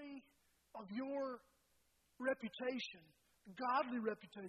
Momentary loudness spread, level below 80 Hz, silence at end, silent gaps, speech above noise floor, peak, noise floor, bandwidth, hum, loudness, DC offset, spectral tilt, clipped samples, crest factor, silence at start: 19 LU; -86 dBFS; 0 s; none; 36 dB; -26 dBFS; -79 dBFS; 13.5 kHz; none; -43 LUFS; under 0.1%; -5 dB/octave; under 0.1%; 20 dB; 0 s